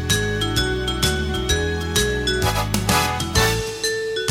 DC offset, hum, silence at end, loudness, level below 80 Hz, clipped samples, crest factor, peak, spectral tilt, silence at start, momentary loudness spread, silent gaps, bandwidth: under 0.1%; none; 0 s; -20 LUFS; -30 dBFS; under 0.1%; 18 dB; -2 dBFS; -3.5 dB/octave; 0 s; 4 LU; none; 16.5 kHz